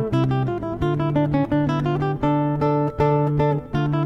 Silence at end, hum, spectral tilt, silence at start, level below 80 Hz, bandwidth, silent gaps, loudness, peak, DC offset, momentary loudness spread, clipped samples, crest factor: 0 s; none; -9.5 dB/octave; 0 s; -40 dBFS; 6.2 kHz; none; -21 LUFS; -6 dBFS; under 0.1%; 4 LU; under 0.1%; 14 dB